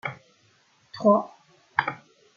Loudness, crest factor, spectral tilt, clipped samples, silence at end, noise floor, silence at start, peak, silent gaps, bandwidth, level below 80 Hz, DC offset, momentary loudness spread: -25 LUFS; 24 dB; -7 dB/octave; under 0.1%; 0.4 s; -63 dBFS; 0.05 s; -4 dBFS; none; 7 kHz; -74 dBFS; under 0.1%; 22 LU